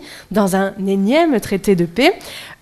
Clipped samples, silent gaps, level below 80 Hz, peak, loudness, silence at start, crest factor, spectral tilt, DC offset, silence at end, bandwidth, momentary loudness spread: under 0.1%; none; -46 dBFS; 0 dBFS; -16 LUFS; 0 s; 16 dB; -5.5 dB/octave; under 0.1%; 0.1 s; 15 kHz; 7 LU